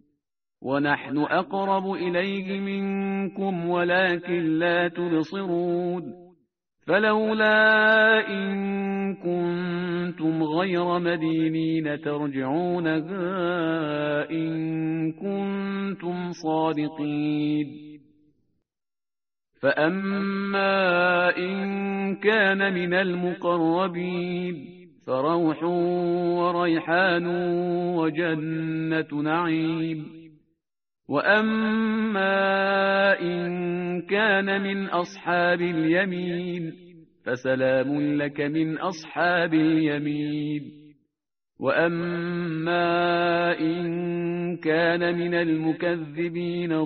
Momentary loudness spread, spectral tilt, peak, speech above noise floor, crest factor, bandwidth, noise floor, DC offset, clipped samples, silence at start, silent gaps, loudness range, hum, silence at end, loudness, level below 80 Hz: 8 LU; -4 dB/octave; -6 dBFS; over 66 dB; 18 dB; 6.2 kHz; under -90 dBFS; under 0.1%; under 0.1%; 0.6 s; none; 6 LU; none; 0 s; -24 LUFS; -66 dBFS